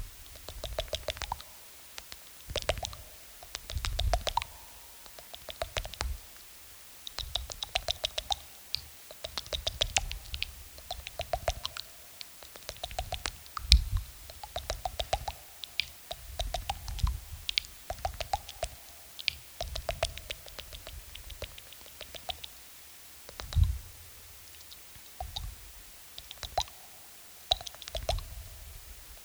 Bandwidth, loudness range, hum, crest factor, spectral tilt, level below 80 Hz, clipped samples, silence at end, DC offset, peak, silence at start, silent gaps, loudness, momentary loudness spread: over 20 kHz; 7 LU; none; 36 dB; -2.5 dB/octave; -40 dBFS; under 0.1%; 0 s; under 0.1%; 0 dBFS; 0 s; none; -36 LUFS; 16 LU